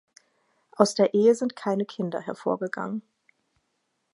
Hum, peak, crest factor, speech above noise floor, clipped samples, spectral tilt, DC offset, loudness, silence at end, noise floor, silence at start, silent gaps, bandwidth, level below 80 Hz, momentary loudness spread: none; -2 dBFS; 24 dB; 51 dB; under 0.1%; -5.5 dB/octave; under 0.1%; -25 LUFS; 1.15 s; -76 dBFS; 0.8 s; none; 11.5 kHz; -78 dBFS; 11 LU